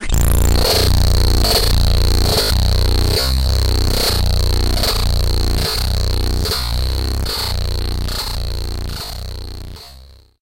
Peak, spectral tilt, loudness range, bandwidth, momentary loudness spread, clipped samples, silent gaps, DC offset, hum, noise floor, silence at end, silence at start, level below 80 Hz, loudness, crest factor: -4 dBFS; -4 dB/octave; 7 LU; 17.5 kHz; 11 LU; under 0.1%; none; under 0.1%; none; -42 dBFS; 0 s; 0 s; -18 dBFS; -17 LUFS; 10 dB